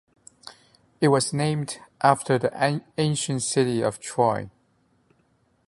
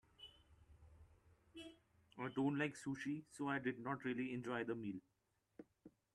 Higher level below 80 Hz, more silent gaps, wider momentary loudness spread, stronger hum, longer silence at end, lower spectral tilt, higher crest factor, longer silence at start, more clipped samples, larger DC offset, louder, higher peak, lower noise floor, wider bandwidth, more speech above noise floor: first, -62 dBFS vs -76 dBFS; neither; second, 13 LU vs 21 LU; neither; first, 1.2 s vs 0.25 s; about the same, -5 dB/octave vs -6 dB/octave; about the same, 22 dB vs 20 dB; first, 0.45 s vs 0.2 s; neither; neither; first, -24 LUFS vs -44 LUFS; first, -4 dBFS vs -28 dBFS; second, -66 dBFS vs -71 dBFS; about the same, 11.5 kHz vs 12 kHz; first, 42 dB vs 28 dB